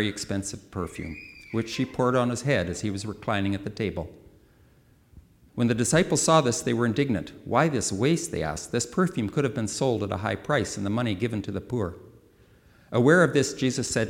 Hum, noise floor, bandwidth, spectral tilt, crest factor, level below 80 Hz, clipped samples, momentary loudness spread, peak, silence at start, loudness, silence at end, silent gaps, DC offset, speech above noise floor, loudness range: none; -58 dBFS; 18 kHz; -5 dB/octave; 20 dB; -52 dBFS; under 0.1%; 12 LU; -6 dBFS; 0 s; -26 LUFS; 0 s; none; under 0.1%; 33 dB; 5 LU